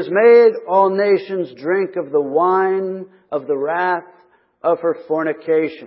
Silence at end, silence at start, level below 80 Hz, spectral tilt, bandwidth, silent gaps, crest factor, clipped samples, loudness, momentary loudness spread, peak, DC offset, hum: 0 s; 0 s; -76 dBFS; -11 dB/octave; 5.8 kHz; none; 16 dB; under 0.1%; -17 LUFS; 13 LU; -2 dBFS; under 0.1%; none